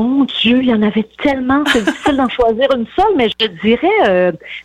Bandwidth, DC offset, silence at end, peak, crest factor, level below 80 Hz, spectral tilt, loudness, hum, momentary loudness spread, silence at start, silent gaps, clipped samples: 12.5 kHz; under 0.1%; 0 s; -2 dBFS; 12 dB; -40 dBFS; -5 dB/octave; -14 LUFS; none; 5 LU; 0 s; none; under 0.1%